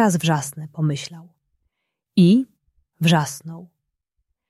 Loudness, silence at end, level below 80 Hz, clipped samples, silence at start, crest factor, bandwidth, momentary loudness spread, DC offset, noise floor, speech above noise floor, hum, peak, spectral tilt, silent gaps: -20 LUFS; 0.85 s; -64 dBFS; under 0.1%; 0 s; 18 dB; 13.5 kHz; 19 LU; under 0.1%; -76 dBFS; 57 dB; none; -4 dBFS; -5.5 dB/octave; none